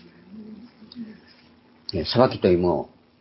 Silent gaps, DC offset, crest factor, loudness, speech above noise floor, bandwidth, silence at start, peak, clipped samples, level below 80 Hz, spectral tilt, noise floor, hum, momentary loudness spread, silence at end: none; under 0.1%; 22 dB; -22 LUFS; 34 dB; 5.8 kHz; 0.3 s; -4 dBFS; under 0.1%; -48 dBFS; -10.5 dB/octave; -55 dBFS; none; 24 LU; 0.35 s